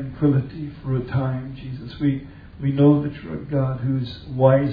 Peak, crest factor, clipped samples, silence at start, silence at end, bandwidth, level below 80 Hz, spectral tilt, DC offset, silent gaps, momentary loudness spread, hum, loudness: -4 dBFS; 18 dB; under 0.1%; 0 s; 0 s; 5 kHz; -46 dBFS; -11.5 dB/octave; under 0.1%; none; 16 LU; none; -22 LUFS